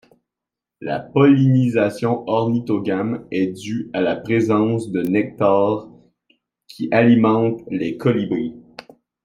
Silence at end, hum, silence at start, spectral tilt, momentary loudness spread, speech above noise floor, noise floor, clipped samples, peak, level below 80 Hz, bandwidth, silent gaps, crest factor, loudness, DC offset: 0.45 s; none; 0.8 s; -8 dB/octave; 12 LU; 68 dB; -86 dBFS; under 0.1%; -2 dBFS; -60 dBFS; 16 kHz; none; 16 dB; -19 LUFS; under 0.1%